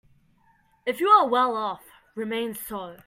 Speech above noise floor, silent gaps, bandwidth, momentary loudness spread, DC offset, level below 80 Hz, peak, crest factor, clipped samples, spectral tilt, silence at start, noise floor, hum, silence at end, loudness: 39 dB; none; 16 kHz; 17 LU; under 0.1%; -66 dBFS; -6 dBFS; 20 dB; under 0.1%; -4 dB/octave; 0.85 s; -63 dBFS; none; 0.1 s; -24 LUFS